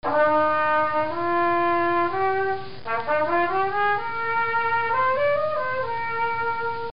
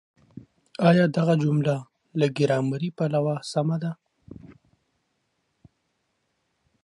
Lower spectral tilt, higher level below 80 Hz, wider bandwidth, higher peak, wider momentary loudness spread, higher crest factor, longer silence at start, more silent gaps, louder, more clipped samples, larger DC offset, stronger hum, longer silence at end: second, -3 dB/octave vs -7.5 dB/octave; first, -58 dBFS vs -66 dBFS; second, 5.4 kHz vs 11.5 kHz; second, -10 dBFS vs -6 dBFS; second, 6 LU vs 13 LU; second, 12 dB vs 20 dB; second, 0 s vs 0.35 s; neither; about the same, -23 LUFS vs -24 LUFS; neither; first, 2% vs under 0.1%; neither; second, 0.1 s vs 2.35 s